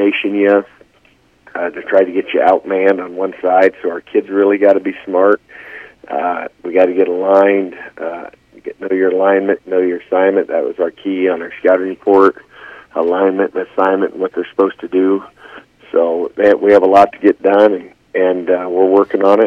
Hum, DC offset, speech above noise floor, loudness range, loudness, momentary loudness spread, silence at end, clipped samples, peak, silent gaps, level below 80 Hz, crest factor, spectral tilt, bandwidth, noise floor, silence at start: none; under 0.1%; 39 dB; 4 LU; -14 LUFS; 13 LU; 0 s; 0.1%; 0 dBFS; none; -60 dBFS; 14 dB; -7 dB/octave; 6.6 kHz; -52 dBFS; 0 s